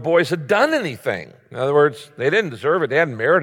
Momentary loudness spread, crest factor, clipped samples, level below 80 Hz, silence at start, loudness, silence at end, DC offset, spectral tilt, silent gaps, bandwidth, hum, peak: 9 LU; 14 dB; under 0.1%; -66 dBFS; 0 s; -19 LUFS; 0 s; under 0.1%; -5.5 dB/octave; none; 16 kHz; none; -4 dBFS